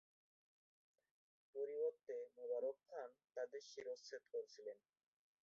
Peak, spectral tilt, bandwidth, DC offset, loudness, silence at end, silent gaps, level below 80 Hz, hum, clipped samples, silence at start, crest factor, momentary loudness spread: -34 dBFS; -0.5 dB/octave; 7.6 kHz; under 0.1%; -50 LUFS; 0.65 s; 3.24-3.28 s; under -90 dBFS; none; under 0.1%; 1.55 s; 16 dB; 11 LU